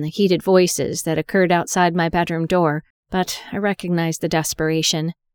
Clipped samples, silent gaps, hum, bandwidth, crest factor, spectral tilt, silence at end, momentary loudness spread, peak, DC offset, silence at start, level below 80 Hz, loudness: under 0.1%; 2.90-3.03 s; none; 20 kHz; 18 dB; -4.5 dB/octave; 0.25 s; 7 LU; -2 dBFS; under 0.1%; 0 s; -48 dBFS; -19 LUFS